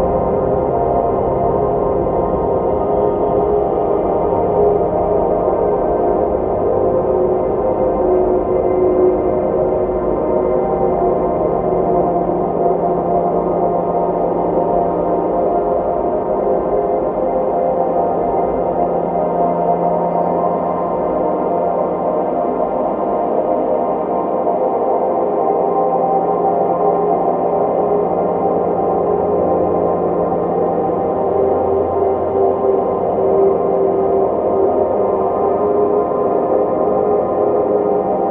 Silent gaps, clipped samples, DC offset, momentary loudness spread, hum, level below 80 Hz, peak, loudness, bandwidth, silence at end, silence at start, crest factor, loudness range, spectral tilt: none; under 0.1%; under 0.1%; 2 LU; none; -38 dBFS; -2 dBFS; -16 LUFS; 3.6 kHz; 0 s; 0 s; 14 dB; 2 LU; -12.5 dB/octave